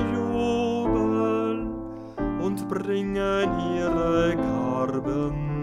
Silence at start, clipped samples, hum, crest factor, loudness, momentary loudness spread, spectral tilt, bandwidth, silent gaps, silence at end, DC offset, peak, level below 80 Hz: 0 s; under 0.1%; none; 14 dB; -25 LUFS; 7 LU; -7 dB/octave; 13 kHz; none; 0 s; under 0.1%; -12 dBFS; -42 dBFS